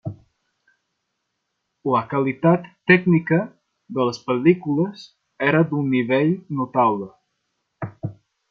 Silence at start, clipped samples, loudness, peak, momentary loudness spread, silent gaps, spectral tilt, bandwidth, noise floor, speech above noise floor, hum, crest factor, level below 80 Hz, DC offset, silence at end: 0.05 s; under 0.1%; -20 LUFS; -2 dBFS; 17 LU; none; -8 dB/octave; 6.8 kHz; -76 dBFS; 57 dB; none; 20 dB; -64 dBFS; under 0.1%; 0.4 s